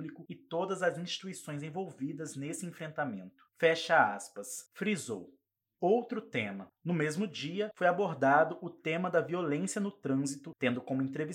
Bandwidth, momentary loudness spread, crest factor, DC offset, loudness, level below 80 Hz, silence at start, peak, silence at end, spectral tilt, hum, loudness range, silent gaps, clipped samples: 16.5 kHz; 14 LU; 22 dB; under 0.1%; -33 LUFS; -90 dBFS; 0 s; -12 dBFS; 0 s; -5 dB/octave; none; 4 LU; none; under 0.1%